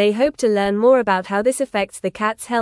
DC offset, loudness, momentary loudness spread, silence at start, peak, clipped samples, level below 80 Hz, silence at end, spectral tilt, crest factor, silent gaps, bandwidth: under 0.1%; -18 LUFS; 8 LU; 0 s; -4 dBFS; under 0.1%; -54 dBFS; 0 s; -4.5 dB/octave; 14 dB; none; 12 kHz